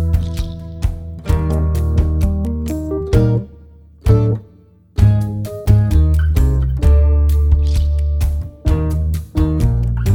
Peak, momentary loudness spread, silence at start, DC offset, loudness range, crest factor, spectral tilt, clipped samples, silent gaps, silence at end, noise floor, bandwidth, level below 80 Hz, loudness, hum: -2 dBFS; 10 LU; 0 s; under 0.1%; 3 LU; 12 dB; -8.5 dB/octave; under 0.1%; none; 0 s; -46 dBFS; 14.5 kHz; -18 dBFS; -17 LUFS; none